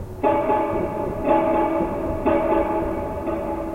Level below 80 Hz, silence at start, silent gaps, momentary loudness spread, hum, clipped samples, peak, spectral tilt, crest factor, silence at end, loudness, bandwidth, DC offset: -38 dBFS; 0 s; none; 7 LU; none; under 0.1%; -6 dBFS; -8.5 dB/octave; 16 dB; 0 s; -22 LUFS; 16 kHz; under 0.1%